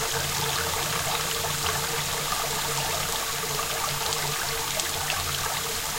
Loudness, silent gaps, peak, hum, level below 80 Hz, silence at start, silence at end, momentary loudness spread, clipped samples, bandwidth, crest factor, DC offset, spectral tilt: -26 LUFS; none; -10 dBFS; none; -46 dBFS; 0 s; 0 s; 1 LU; under 0.1%; 16 kHz; 18 dB; under 0.1%; -1.5 dB/octave